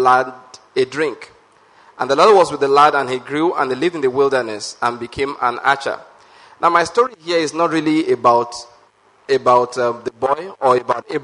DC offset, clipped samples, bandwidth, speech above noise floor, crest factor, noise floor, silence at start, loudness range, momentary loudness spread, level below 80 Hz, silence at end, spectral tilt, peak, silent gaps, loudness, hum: under 0.1%; under 0.1%; 11 kHz; 36 dB; 18 dB; -53 dBFS; 0 s; 4 LU; 11 LU; -58 dBFS; 0 s; -4.5 dB/octave; 0 dBFS; none; -17 LUFS; none